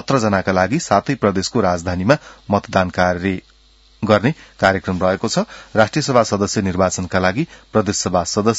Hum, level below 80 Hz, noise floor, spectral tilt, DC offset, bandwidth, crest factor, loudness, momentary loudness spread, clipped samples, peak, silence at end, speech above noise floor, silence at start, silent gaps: none; -48 dBFS; -51 dBFS; -5 dB/octave; under 0.1%; 8 kHz; 18 dB; -18 LUFS; 5 LU; under 0.1%; 0 dBFS; 0 s; 34 dB; 0.1 s; none